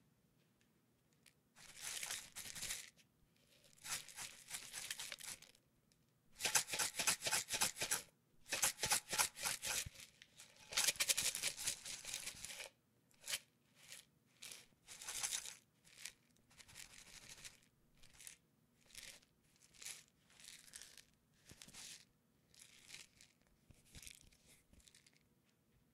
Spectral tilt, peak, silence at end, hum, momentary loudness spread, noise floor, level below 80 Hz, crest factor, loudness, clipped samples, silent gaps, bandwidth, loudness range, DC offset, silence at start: 1 dB/octave; -16 dBFS; 0.95 s; none; 23 LU; -77 dBFS; -74 dBFS; 32 dB; -41 LUFS; under 0.1%; none; 16 kHz; 20 LU; under 0.1%; 1.25 s